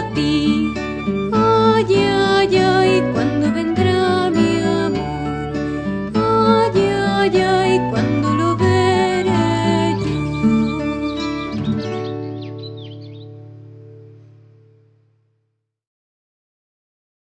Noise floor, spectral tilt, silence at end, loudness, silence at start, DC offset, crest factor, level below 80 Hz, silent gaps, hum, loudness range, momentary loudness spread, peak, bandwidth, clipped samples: -71 dBFS; -6.5 dB/octave; 3.25 s; -17 LUFS; 0 s; under 0.1%; 16 dB; -42 dBFS; none; none; 12 LU; 11 LU; -2 dBFS; 10 kHz; under 0.1%